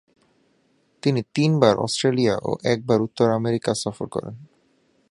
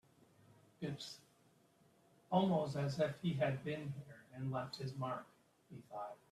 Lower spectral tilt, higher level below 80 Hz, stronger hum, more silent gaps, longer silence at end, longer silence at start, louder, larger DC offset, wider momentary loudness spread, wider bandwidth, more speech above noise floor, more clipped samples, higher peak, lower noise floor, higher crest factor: about the same, -6 dB/octave vs -7 dB/octave; first, -58 dBFS vs -78 dBFS; neither; neither; first, 0.65 s vs 0.15 s; first, 1.05 s vs 0.8 s; first, -22 LUFS vs -41 LUFS; neither; second, 11 LU vs 15 LU; second, 11.5 kHz vs 13.5 kHz; first, 43 dB vs 31 dB; neither; first, 0 dBFS vs -20 dBFS; second, -64 dBFS vs -72 dBFS; about the same, 22 dB vs 22 dB